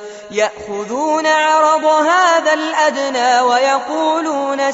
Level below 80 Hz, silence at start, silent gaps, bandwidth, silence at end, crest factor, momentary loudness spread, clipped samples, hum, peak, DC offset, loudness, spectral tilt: -62 dBFS; 0 s; none; 8 kHz; 0 s; 14 dB; 7 LU; under 0.1%; none; -2 dBFS; under 0.1%; -14 LUFS; 0 dB/octave